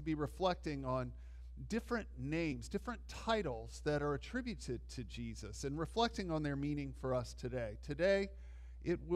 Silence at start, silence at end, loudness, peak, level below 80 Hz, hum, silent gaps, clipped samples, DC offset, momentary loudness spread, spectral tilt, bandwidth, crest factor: 0 s; 0 s; -40 LUFS; -20 dBFS; -52 dBFS; none; none; under 0.1%; under 0.1%; 10 LU; -6 dB/octave; 14 kHz; 20 dB